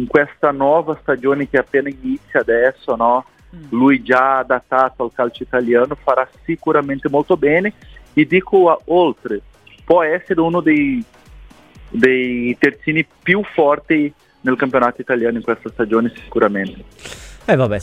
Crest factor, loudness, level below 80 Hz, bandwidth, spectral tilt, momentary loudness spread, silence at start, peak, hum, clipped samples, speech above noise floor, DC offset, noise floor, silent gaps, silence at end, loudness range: 16 dB; -16 LUFS; -46 dBFS; 10 kHz; -7 dB/octave; 10 LU; 0 s; 0 dBFS; none; under 0.1%; 26 dB; under 0.1%; -41 dBFS; none; 0 s; 2 LU